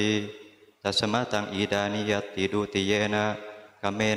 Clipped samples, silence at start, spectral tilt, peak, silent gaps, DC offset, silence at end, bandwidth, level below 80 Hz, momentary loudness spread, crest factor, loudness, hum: under 0.1%; 0 s; -4.5 dB/octave; -10 dBFS; none; under 0.1%; 0 s; 13.5 kHz; -62 dBFS; 10 LU; 18 dB; -27 LUFS; none